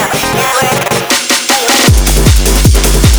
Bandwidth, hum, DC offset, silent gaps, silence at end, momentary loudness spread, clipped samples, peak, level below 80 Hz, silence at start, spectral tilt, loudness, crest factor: over 20 kHz; none; under 0.1%; none; 0 s; 4 LU; 0.5%; 0 dBFS; -12 dBFS; 0 s; -3.5 dB/octave; -8 LUFS; 8 dB